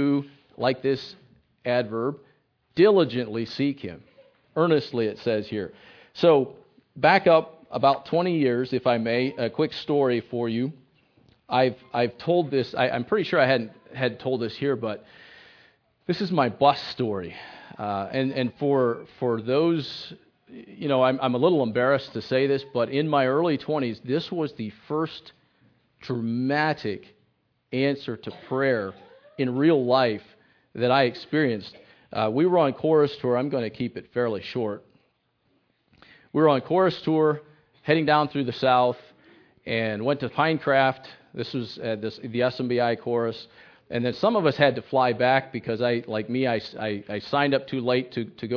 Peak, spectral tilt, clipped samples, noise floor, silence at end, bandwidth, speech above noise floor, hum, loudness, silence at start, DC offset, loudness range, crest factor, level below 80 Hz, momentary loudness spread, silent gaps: -4 dBFS; -8 dB/octave; under 0.1%; -70 dBFS; 0 s; 5.4 kHz; 46 dB; none; -24 LUFS; 0 s; under 0.1%; 5 LU; 22 dB; -68 dBFS; 12 LU; none